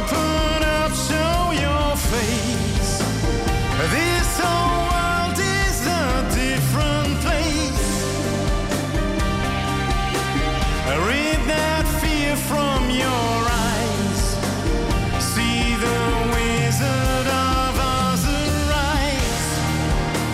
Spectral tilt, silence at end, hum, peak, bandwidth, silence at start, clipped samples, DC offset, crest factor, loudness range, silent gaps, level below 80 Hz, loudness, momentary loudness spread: -4.5 dB/octave; 0 s; none; -10 dBFS; 16 kHz; 0 s; under 0.1%; under 0.1%; 10 dB; 2 LU; none; -26 dBFS; -20 LUFS; 3 LU